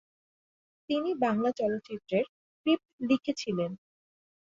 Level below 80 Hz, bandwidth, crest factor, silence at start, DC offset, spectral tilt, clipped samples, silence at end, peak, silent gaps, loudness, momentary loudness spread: -72 dBFS; 7.6 kHz; 18 dB; 0.9 s; under 0.1%; -6 dB/octave; under 0.1%; 0.8 s; -14 dBFS; 2.29-2.64 s, 2.85-2.98 s; -31 LUFS; 8 LU